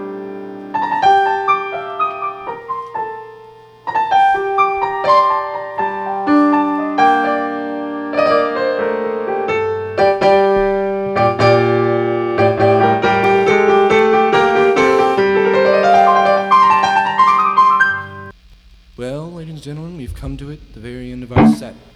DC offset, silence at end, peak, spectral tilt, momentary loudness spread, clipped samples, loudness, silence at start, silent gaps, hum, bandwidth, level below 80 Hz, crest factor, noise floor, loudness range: under 0.1%; 0.2 s; 0 dBFS; -6.5 dB/octave; 17 LU; under 0.1%; -14 LUFS; 0 s; none; none; 11 kHz; -44 dBFS; 14 dB; -44 dBFS; 7 LU